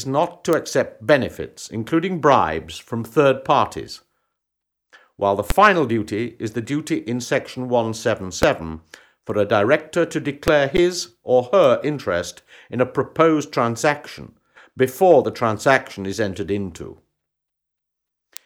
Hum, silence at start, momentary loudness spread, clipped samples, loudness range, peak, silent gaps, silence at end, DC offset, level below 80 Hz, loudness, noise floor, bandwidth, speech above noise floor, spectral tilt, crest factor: none; 0 s; 14 LU; under 0.1%; 3 LU; -2 dBFS; none; 1.55 s; under 0.1%; -44 dBFS; -20 LUFS; -81 dBFS; over 20 kHz; 61 dB; -5 dB/octave; 18 dB